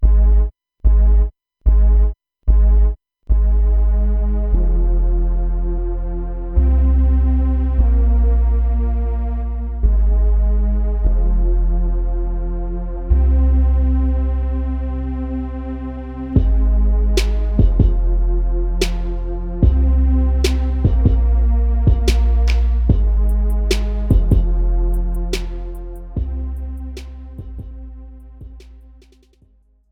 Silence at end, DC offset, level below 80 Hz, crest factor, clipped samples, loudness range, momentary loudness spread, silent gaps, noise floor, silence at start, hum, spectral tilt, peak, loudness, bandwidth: 1.15 s; under 0.1%; -16 dBFS; 14 dB; under 0.1%; 6 LU; 11 LU; none; -53 dBFS; 0 s; none; -7.5 dB/octave; -2 dBFS; -19 LUFS; 7.6 kHz